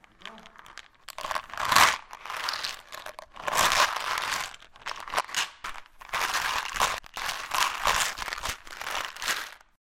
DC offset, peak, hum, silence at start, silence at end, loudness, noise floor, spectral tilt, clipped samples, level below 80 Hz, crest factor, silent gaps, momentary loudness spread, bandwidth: under 0.1%; 0 dBFS; none; 0.2 s; 0.4 s; -27 LUFS; -49 dBFS; 0 dB/octave; under 0.1%; -52 dBFS; 30 dB; none; 21 LU; 16.5 kHz